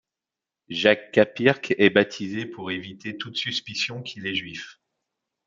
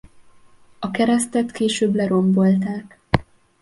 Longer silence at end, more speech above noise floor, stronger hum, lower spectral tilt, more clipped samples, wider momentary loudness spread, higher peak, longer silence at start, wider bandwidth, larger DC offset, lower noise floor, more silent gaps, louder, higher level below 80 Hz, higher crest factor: first, 0.75 s vs 0.4 s; first, 65 dB vs 30 dB; neither; about the same, -5 dB/octave vs -6 dB/octave; neither; first, 15 LU vs 11 LU; about the same, -2 dBFS vs 0 dBFS; about the same, 0.7 s vs 0.8 s; second, 7.6 kHz vs 11.5 kHz; neither; first, -89 dBFS vs -49 dBFS; neither; second, -24 LUFS vs -20 LUFS; second, -68 dBFS vs -46 dBFS; about the same, 24 dB vs 20 dB